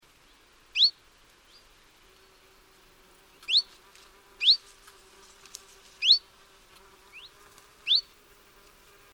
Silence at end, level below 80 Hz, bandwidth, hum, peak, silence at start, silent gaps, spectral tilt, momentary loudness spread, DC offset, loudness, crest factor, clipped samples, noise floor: 1.1 s; -68 dBFS; over 20 kHz; none; -8 dBFS; 0.75 s; none; 2 dB/octave; 26 LU; under 0.1%; -23 LUFS; 24 dB; under 0.1%; -59 dBFS